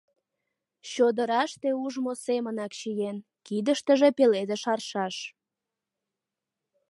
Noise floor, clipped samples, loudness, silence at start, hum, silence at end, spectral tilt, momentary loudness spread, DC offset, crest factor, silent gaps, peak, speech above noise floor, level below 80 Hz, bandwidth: -88 dBFS; under 0.1%; -27 LUFS; 0.85 s; none; 1.6 s; -4.5 dB/octave; 14 LU; under 0.1%; 20 dB; none; -8 dBFS; 62 dB; -82 dBFS; 11.5 kHz